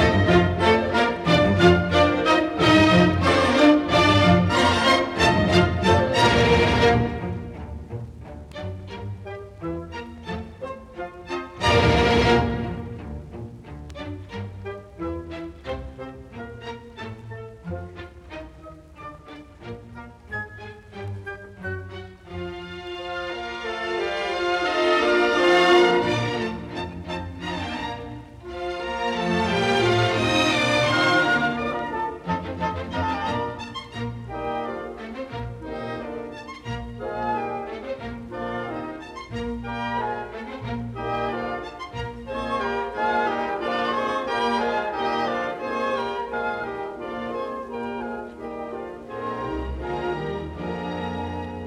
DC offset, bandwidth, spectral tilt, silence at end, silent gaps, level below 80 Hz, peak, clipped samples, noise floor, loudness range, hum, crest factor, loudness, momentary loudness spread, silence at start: under 0.1%; 13 kHz; -5.5 dB/octave; 0 s; none; -42 dBFS; -4 dBFS; under 0.1%; -44 dBFS; 17 LU; none; 20 dB; -23 LUFS; 19 LU; 0 s